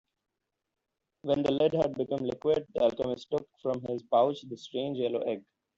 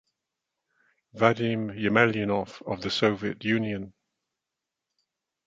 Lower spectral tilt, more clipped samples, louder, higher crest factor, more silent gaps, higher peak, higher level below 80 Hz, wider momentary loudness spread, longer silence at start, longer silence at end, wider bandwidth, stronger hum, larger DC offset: about the same, -7 dB/octave vs -6 dB/octave; neither; second, -30 LUFS vs -26 LUFS; second, 18 dB vs 26 dB; neither; second, -14 dBFS vs -4 dBFS; about the same, -66 dBFS vs -62 dBFS; about the same, 9 LU vs 11 LU; about the same, 1.25 s vs 1.15 s; second, 0.35 s vs 1.55 s; about the same, 7.6 kHz vs 7.8 kHz; neither; neither